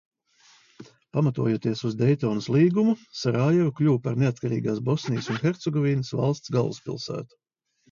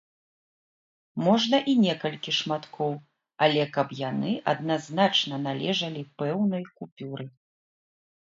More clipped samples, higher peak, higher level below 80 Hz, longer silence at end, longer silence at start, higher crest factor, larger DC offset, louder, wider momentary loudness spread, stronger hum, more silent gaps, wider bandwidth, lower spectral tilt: neither; about the same, -8 dBFS vs -6 dBFS; first, -62 dBFS vs -74 dBFS; second, 0.65 s vs 1 s; second, 0.8 s vs 1.15 s; about the same, 16 dB vs 20 dB; neither; about the same, -25 LUFS vs -26 LUFS; second, 9 LU vs 15 LU; neither; second, none vs 6.92-6.96 s; about the same, 7.4 kHz vs 7.6 kHz; first, -7.5 dB/octave vs -5.5 dB/octave